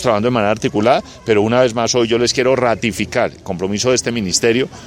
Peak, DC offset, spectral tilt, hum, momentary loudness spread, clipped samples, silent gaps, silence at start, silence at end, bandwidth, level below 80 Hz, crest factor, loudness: 0 dBFS; under 0.1%; -4 dB/octave; none; 4 LU; under 0.1%; none; 0 s; 0 s; 16 kHz; -46 dBFS; 14 dB; -16 LUFS